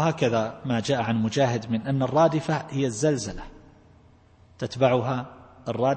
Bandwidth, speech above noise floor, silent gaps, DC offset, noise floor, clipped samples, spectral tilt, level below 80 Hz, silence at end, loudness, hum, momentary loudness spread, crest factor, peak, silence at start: 8.8 kHz; 31 dB; none; under 0.1%; -55 dBFS; under 0.1%; -6 dB/octave; -52 dBFS; 0 s; -25 LUFS; none; 14 LU; 20 dB; -6 dBFS; 0 s